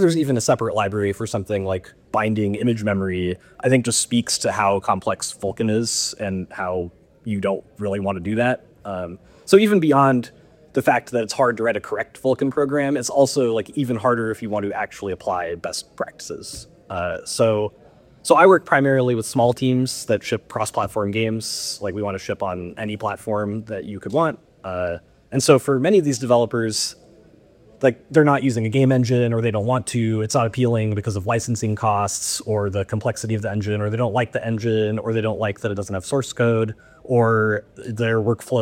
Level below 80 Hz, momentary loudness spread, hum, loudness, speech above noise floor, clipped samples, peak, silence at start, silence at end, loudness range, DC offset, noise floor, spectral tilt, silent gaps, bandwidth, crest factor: -56 dBFS; 11 LU; none; -21 LUFS; 30 dB; under 0.1%; 0 dBFS; 0 s; 0 s; 6 LU; under 0.1%; -51 dBFS; -5 dB/octave; none; 16.5 kHz; 20 dB